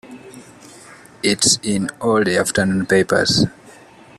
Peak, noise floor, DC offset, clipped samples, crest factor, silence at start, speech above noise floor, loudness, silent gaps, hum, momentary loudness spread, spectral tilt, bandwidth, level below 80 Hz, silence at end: -2 dBFS; -44 dBFS; under 0.1%; under 0.1%; 18 dB; 0.05 s; 27 dB; -17 LUFS; none; none; 8 LU; -3.5 dB/octave; 14 kHz; -52 dBFS; 0.5 s